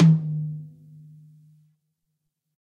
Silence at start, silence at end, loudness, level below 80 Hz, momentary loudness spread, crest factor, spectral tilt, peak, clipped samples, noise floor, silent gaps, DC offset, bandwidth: 0 s; 2 s; -25 LUFS; -70 dBFS; 28 LU; 18 dB; -9 dB/octave; -8 dBFS; under 0.1%; -79 dBFS; none; under 0.1%; 4.3 kHz